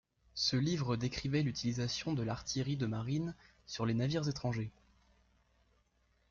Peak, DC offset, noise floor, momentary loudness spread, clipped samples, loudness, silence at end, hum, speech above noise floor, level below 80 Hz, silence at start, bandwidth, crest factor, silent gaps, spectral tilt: -22 dBFS; under 0.1%; -74 dBFS; 9 LU; under 0.1%; -36 LUFS; 1.6 s; 60 Hz at -55 dBFS; 39 dB; -60 dBFS; 0.35 s; 7.4 kHz; 16 dB; none; -5.5 dB/octave